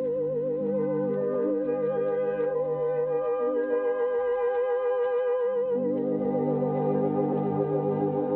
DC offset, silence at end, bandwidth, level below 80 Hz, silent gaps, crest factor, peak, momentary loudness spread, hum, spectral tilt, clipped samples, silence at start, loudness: under 0.1%; 0 s; 3.4 kHz; -66 dBFS; none; 12 dB; -14 dBFS; 2 LU; none; -8.5 dB/octave; under 0.1%; 0 s; -27 LUFS